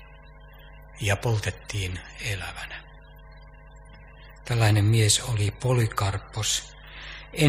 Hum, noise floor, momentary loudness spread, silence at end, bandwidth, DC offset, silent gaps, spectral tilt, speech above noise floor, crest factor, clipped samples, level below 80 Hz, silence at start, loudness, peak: none; -47 dBFS; 19 LU; 0 s; 15.5 kHz; under 0.1%; none; -4 dB/octave; 22 dB; 22 dB; under 0.1%; -46 dBFS; 0 s; -25 LUFS; -4 dBFS